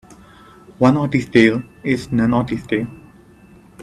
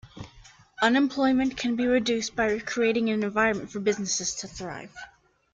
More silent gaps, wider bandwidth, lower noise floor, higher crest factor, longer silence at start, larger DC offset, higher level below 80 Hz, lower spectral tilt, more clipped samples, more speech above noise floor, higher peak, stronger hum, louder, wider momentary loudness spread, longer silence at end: neither; first, 11.5 kHz vs 9.2 kHz; second, -46 dBFS vs -53 dBFS; about the same, 18 dB vs 20 dB; first, 0.8 s vs 0.05 s; neither; first, -46 dBFS vs -56 dBFS; first, -7 dB/octave vs -3.5 dB/octave; neither; about the same, 29 dB vs 27 dB; first, 0 dBFS vs -8 dBFS; neither; first, -17 LUFS vs -25 LUFS; second, 9 LU vs 18 LU; second, 0 s vs 0.45 s